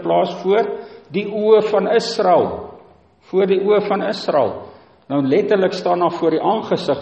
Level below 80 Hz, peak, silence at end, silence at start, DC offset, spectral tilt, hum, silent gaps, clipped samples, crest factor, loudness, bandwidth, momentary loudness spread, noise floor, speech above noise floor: -58 dBFS; -2 dBFS; 0 s; 0 s; under 0.1%; -6 dB/octave; none; none; under 0.1%; 16 dB; -17 LUFS; 8.4 kHz; 10 LU; -48 dBFS; 31 dB